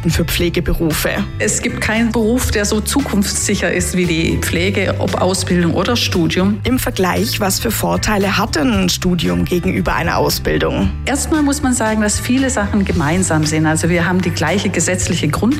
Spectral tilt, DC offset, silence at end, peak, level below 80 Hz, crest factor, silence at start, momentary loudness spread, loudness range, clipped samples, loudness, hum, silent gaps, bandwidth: -4.5 dB/octave; under 0.1%; 0 s; -6 dBFS; -28 dBFS; 10 dB; 0 s; 2 LU; 1 LU; under 0.1%; -15 LUFS; none; none; 16 kHz